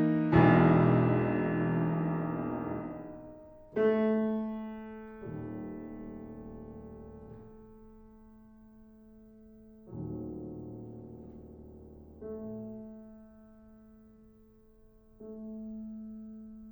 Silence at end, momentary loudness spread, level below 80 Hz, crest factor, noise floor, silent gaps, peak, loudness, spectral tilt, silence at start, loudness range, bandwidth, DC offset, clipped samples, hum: 0 s; 26 LU; -56 dBFS; 24 dB; -60 dBFS; none; -10 dBFS; -30 LUFS; -11 dB/octave; 0 s; 19 LU; over 20 kHz; under 0.1%; under 0.1%; none